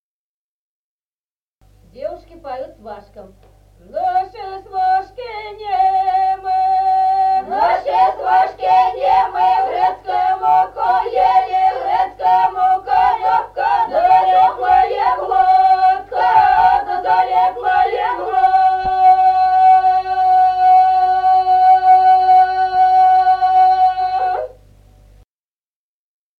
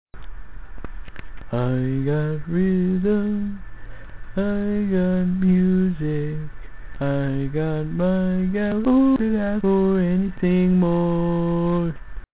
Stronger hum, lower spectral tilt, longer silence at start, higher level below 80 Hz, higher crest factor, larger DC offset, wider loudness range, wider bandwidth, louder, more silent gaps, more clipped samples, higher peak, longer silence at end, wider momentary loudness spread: first, 50 Hz at -50 dBFS vs none; second, -4.5 dB/octave vs -12.5 dB/octave; first, 1.95 s vs 0.05 s; second, -48 dBFS vs -38 dBFS; about the same, 14 dB vs 12 dB; second, under 0.1% vs 2%; first, 11 LU vs 4 LU; first, 5.6 kHz vs 4 kHz; first, -14 LUFS vs -21 LUFS; neither; neither; first, -2 dBFS vs -8 dBFS; first, 1.9 s vs 0.05 s; about the same, 11 LU vs 13 LU